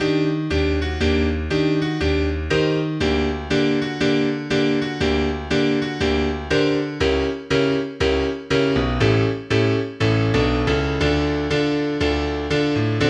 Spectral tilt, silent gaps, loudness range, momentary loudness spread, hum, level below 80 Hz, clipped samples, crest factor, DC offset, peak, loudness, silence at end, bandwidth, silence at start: -6.5 dB/octave; none; 1 LU; 2 LU; none; -32 dBFS; under 0.1%; 16 dB; under 0.1%; -4 dBFS; -20 LUFS; 0 s; 9.8 kHz; 0 s